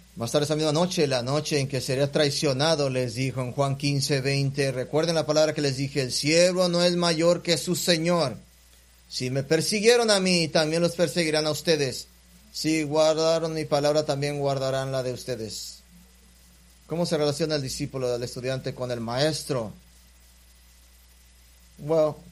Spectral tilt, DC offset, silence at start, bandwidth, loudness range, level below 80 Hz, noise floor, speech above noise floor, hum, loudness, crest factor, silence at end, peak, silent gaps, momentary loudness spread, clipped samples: -4.5 dB/octave; under 0.1%; 0.15 s; 15.5 kHz; 7 LU; -56 dBFS; -55 dBFS; 30 dB; none; -24 LUFS; 22 dB; 0 s; -4 dBFS; none; 10 LU; under 0.1%